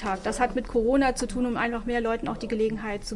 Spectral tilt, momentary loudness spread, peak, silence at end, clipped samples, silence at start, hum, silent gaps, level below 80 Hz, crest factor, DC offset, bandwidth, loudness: -4.5 dB/octave; 6 LU; -10 dBFS; 0 s; under 0.1%; 0 s; none; none; -40 dBFS; 16 dB; under 0.1%; 11.5 kHz; -27 LUFS